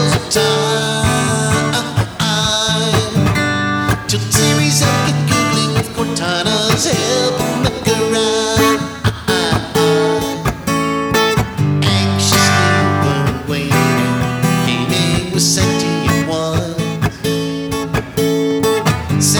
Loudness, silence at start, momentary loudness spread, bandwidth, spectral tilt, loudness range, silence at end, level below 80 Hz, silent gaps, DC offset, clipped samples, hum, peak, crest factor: -15 LUFS; 0 s; 6 LU; over 20 kHz; -4 dB/octave; 2 LU; 0 s; -36 dBFS; none; under 0.1%; under 0.1%; none; 0 dBFS; 14 dB